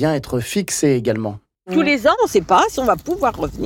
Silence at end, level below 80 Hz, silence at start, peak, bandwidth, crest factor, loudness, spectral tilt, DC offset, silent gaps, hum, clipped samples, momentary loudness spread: 0 s; -42 dBFS; 0 s; -4 dBFS; 17 kHz; 12 dB; -18 LUFS; -5 dB/octave; under 0.1%; none; none; under 0.1%; 7 LU